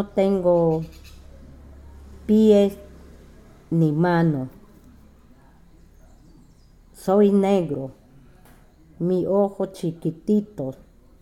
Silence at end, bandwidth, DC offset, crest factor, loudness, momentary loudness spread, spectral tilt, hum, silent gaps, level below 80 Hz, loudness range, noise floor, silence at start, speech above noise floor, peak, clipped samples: 0.45 s; 14 kHz; under 0.1%; 18 dB; -21 LUFS; 16 LU; -8.5 dB/octave; none; none; -50 dBFS; 4 LU; -51 dBFS; 0 s; 31 dB; -6 dBFS; under 0.1%